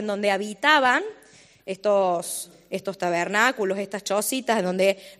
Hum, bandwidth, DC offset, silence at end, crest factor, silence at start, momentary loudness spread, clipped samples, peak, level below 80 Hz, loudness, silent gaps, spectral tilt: none; 15 kHz; under 0.1%; 0.05 s; 20 dB; 0 s; 14 LU; under 0.1%; -4 dBFS; -72 dBFS; -23 LUFS; none; -3 dB/octave